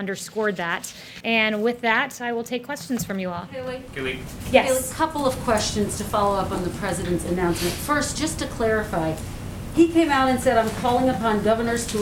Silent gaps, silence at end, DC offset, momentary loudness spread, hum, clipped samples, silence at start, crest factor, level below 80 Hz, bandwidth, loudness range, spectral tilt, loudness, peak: none; 0 s; under 0.1%; 10 LU; none; under 0.1%; 0 s; 22 dB; -42 dBFS; 18 kHz; 3 LU; -4.5 dB/octave; -23 LUFS; -2 dBFS